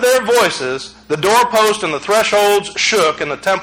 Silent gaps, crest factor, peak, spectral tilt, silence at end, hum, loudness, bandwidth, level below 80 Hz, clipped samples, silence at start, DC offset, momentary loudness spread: none; 12 dB; -2 dBFS; -2 dB/octave; 0 s; none; -14 LUFS; 17 kHz; -52 dBFS; under 0.1%; 0 s; under 0.1%; 9 LU